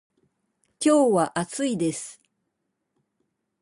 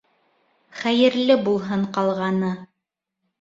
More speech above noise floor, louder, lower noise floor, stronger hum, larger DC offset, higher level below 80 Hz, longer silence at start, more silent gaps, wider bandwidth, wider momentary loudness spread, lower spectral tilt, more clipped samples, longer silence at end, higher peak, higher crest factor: second, 56 dB vs 62 dB; about the same, -23 LUFS vs -21 LUFS; second, -78 dBFS vs -82 dBFS; neither; neither; about the same, -68 dBFS vs -64 dBFS; about the same, 0.8 s vs 0.75 s; neither; first, 11.5 kHz vs 7.8 kHz; about the same, 12 LU vs 10 LU; second, -5 dB/octave vs -6.5 dB/octave; neither; first, 1.5 s vs 0.75 s; second, -10 dBFS vs -4 dBFS; about the same, 18 dB vs 18 dB